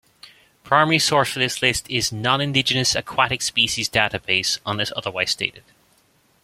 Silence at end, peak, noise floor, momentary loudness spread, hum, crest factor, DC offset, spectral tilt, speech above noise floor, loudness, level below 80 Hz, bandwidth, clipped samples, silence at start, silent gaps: 0.85 s; 0 dBFS; -60 dBFS; 7 LU; none; 22 dB; under 0.1%; -2.5 dB/octave; 39 dB; -20 LUFS; -52 dBFS; 16.5 kHz; under 0.1%; 0.25 s; none